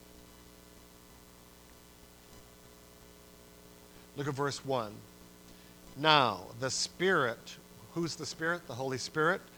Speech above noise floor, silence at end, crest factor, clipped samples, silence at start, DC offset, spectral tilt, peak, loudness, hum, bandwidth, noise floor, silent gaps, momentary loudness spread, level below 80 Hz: 24 dB; 0 s; 30 dB; under 0.1%; 0.15 s; under 0.1%; -3.5 dB/octave; -6 dBFS; -32 LUFS; 60 Hz at -60 dBFS; over 20 kHz; -56 dBFS; none; 26 LU; -64 dBFS